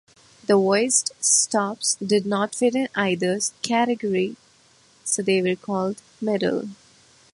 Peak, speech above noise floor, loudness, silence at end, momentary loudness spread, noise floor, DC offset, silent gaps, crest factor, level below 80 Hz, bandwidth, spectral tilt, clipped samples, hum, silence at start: -4 dBFS; 34 dB; -22 LUFS; 0.6 s; 11 LU; -56 dBFS; under 0.1%; none; 20 dB; -68 dBFS; 11.5 kHz; -3 dB/octave; under 0.1%; none; 0.5 s